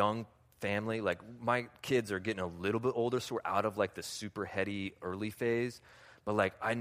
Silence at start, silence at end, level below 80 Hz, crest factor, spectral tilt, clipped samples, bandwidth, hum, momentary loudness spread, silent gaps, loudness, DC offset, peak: 0 s; 0 s; -68 dBFS; 20 dB; -5.5 dB/octave; under 0.1%; 15.5 kHz; none; 8 LU; none; -35 LUFS; under 0.1%; -14 dBFS